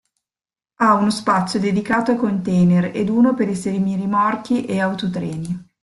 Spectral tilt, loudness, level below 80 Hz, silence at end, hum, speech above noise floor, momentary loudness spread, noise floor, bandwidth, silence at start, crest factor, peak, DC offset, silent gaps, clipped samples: -6.5 dB/octave; -19 LUFS; -54 dBFS; 0.2 s; none; over 72 dB; 8 LU; under -90 dBFS; 11.5 kHz; 0.8 s; 16 dB; -2 dBFS; under 0.1%; none; under 0.1%